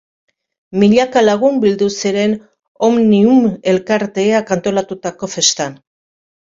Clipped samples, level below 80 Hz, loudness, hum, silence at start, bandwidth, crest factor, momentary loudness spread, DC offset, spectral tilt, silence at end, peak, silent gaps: under 0.1%; -54 dBFS; -14 LUFS; none; 0.7 s; 7.8 kHz; 14 dB; 12 LU; under 0.1%; -4.5 dB/octave; 0.75 s; 0 dBFS; 2.68-2.75 s